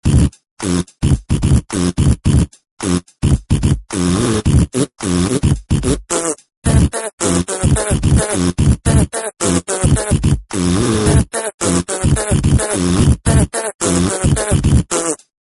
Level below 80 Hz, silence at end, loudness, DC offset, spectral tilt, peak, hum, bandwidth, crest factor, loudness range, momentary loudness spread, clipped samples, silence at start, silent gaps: -22 dBFS; 0.25 s; -16 LUFS; under 0.1%; -5.5 dB/octave; 0 dBFS; none; 11.5 kHz; 14 dB; 2 LU; 5 LU; under 0.1%; 0.05 s; 0.51-0.57 s, 2.71-2.77 s, 6.57-6.62 s, 7.13-7.18 s, 11.54-11.58 s, 13.74-13.79 s